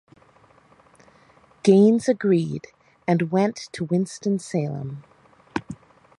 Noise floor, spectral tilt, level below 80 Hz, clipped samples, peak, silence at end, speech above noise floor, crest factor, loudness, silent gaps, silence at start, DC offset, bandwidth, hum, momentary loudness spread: -55 dBFS; -7 dB/octave; -62 dBFS; under 0.1%; -4 dBFS; 0.45 s; 35 dB; 20 dB; -22 LUFS; none; 1.65 s; under 0.1%; 11.5 kHz; none; 19 LU